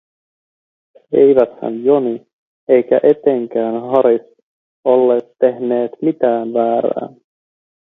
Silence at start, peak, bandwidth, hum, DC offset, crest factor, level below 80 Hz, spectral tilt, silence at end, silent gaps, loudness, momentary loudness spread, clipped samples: 1.1 s; 0 dBFS; 4 kHz; none; under 0.1%; 16 dB; -64 dBFS; -10 dB/octave; 0.85 s; 2.33-2.67 s, 4.42-4.83 s; -15 LUFS; 10 LU; under 0.1%